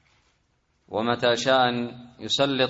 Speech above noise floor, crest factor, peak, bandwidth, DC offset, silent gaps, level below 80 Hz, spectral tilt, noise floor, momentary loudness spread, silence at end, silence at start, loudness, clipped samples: 45 dB; 18 dB; -6 dBFS; 8 kHz; under 0.1%; none; -64 dBFS; -4 dB/octave; -69 dBFS; 13 LU; 0 s; 0.9 s; -23 LUFS; under 0.1%